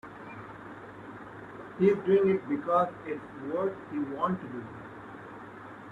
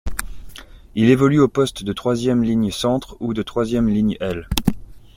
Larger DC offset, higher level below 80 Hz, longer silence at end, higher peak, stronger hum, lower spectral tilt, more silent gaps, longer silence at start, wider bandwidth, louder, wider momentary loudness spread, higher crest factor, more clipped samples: neither; second, -68 dBFS vs -36 dBFS; second, 0 s vs 0.2 s; second, -12 dBFS vs 0 dBFS; neither; first, -9 dB/octave vs -6 dB/octave; neither; about the same, 0.05 s vs 0.05 s; second, 4.5 kHz vs 16.5 kHz; second, -29 LUFS vs -19 LUFS; first, 20 LU vs 15 LU; about the same, 20 dB vs 20 dB; neither